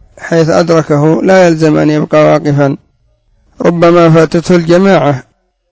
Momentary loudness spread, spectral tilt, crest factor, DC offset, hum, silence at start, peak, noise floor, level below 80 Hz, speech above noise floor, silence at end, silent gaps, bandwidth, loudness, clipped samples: 8 LU; -7 dB/octave; 8 dB; under 0.1%; none; 0.2 s; 0 dBFS; -52 dBFS; -44 dBFS; 45 dB; 0.5 s; none; 8 kHz; -8 LUFS; 1%